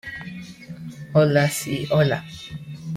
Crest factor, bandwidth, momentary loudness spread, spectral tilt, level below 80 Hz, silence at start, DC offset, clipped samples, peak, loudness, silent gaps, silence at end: 18 dB; 15.5 kHz; 19 LU; -5.5 dB/octave; -56 dBFS; 0.05 s; under 0.1%; under 0.1%; -6 dBFS; -21 LUFS; none; 0 s